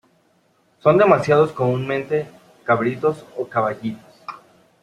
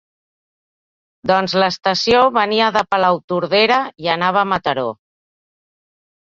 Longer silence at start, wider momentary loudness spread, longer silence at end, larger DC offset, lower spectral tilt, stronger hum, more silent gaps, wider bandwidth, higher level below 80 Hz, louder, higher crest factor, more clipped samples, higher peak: second, 0.85 s vs 1.25 s; first, 22 LU vs 7 LU; second, 0.45 s vs 1.35 s; neither; first, -7.5 dB/octave vs -4.5 dB/octave; neither; second, none vs 3.24-3.28 s; first, 11.5 kHz vs 7.8 kHz; second, -60 dBFS vs -54 dBFS; second, -19 LUFS vs -16 LUFS; about the same, 20 dB vs 18 dB; neither; about the same, -2 dBFS vs -2 dBFS